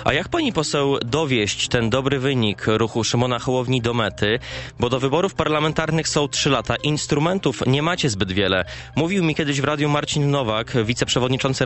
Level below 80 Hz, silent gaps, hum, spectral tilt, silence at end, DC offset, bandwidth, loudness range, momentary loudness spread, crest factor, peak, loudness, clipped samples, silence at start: -44 dBFS; none; none; -4.5 dB/octave; 0 s; under 0.1%; 8.4 kHz; 1 LU; 2 LU; 18 dB; -2 dBFS; -20 LUFS; under 0.1%; 0 s